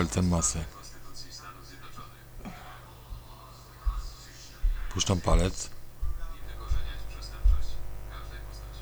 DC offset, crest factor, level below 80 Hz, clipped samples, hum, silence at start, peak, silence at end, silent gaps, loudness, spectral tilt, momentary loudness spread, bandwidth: under 0.1%; 20 dB; -34 dBFS; under 0.1%; none; 0 s; -10 dBFS; 0 s; none; -33 LUFS; -4.5 dB/octave; 20 LU; over 20 kHz